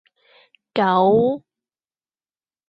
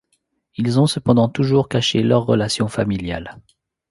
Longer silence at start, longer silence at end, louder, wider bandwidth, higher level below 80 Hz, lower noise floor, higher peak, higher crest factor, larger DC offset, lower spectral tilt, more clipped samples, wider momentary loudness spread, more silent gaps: first, 0.75 s vs 0.6 s; first, 1.3 s vs 0.5 s; about the same, -18 LUFS vs -18 LUFS; second, 5.6 kHz vs 11.5 kHz; second, -62 dBFS vs -46 dBFS; first, under -90 dBFS vs -68 dBFS; second, -6 dBFS vs 0 dBFS; about the same, 16 dB vs 18 dB; neither; first, -8.5 dB/octave vs -6 dB/octave; neither; about the same, 12 LU vs 11 LU; neither